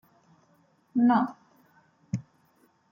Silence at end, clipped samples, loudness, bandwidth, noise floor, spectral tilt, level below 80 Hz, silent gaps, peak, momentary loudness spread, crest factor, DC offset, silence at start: 0.7 s; under 0.1%; -27 LUFS; 7.2 kHz; -66 dBFS; -8 dB/octave; -70 dBFS; none; -12 dBFS; 14 LU; 20 dB; under 0.1%; 0.95 s